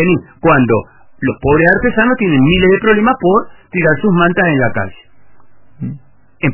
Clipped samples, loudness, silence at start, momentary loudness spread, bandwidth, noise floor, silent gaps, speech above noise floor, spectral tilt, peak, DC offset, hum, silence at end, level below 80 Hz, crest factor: under 0.1%; -12 LUFS; 0 s; 12 LU; 3.1 kHz; -51 dBFS; none; 39 dB; -10.5 dB/octave; 0 dBFS; under 0.1%; none; 0 s; -34 dBFS; 12 dB